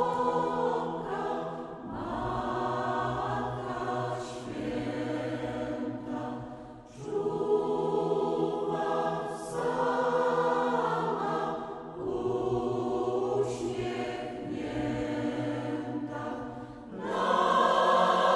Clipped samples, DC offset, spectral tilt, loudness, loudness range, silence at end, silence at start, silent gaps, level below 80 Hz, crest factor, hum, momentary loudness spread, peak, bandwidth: under 0.1%; under 0.1%; -6 dB/octave; -31 LUFS; 5 LU; 0 s; 0 s; none; -58 dBFS; 18 dB; none; 11 LU; -12 dBFS; 11.5 kHz